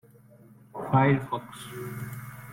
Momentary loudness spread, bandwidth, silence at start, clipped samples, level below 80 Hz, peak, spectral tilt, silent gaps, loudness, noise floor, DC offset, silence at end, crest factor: 18 LU; 16.5 kHz; 0.75 s; under 0.1%; -60 dBFS; -10 dBFS; -7.5 dB/octave; none; -28 LUFS; -54 dBFS; under 0.1%; 0 s; 20 dB